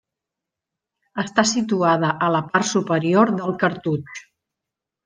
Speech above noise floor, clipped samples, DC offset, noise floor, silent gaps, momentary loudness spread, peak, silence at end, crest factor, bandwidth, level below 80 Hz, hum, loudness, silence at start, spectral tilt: 65 dB; under 0.1%; under 0.1%; -85 dBFS; none; 11 LU; -2 dBFS; 0.85 s; 20 dB; 10 kHz; -66 dBFS; none; -20 LUFS; 1.15 s; -5 dB/octave